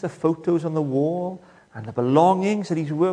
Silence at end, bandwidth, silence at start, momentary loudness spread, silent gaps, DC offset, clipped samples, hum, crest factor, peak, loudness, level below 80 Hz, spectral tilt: 0 s; 10 kHz; 0 s; 16 LU; none; under 0.1%; under 0.1%; none; 18 dB; -4 dBFS; -22 LUFS; -66 dBFS; -8 dB/octave